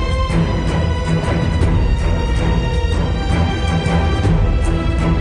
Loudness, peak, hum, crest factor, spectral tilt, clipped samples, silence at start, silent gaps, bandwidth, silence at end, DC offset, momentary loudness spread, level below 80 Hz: -17 LUFS; -4 dBFS; none; 12 dB; -7 dB/octave; under 0.1%; 0 s; none; 11 kHz; 0 s; under 0.1%; 2 LU; -20 dBFS